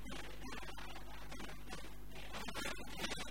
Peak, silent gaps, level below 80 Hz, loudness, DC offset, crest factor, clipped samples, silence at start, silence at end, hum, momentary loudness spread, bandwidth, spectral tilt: -28 dBFS; none; -56 dBFS; -48 LUFS; 0.6%; 22 dB; under 0.1%; 0 s; 0 s; 50 Hz at -55 dBFS; 8 LU; 16 kHz; -3 dB/octave